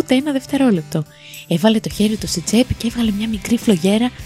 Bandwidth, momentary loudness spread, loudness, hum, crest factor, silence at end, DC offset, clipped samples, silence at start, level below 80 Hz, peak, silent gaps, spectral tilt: 15.5 kHz; 8 LU; -18 LUFS; none; 14 dB; 0 s; under 0.1%; under 0.1%; 0 s; -40 dBFS; -2 dBFS; none; -5 dB/octave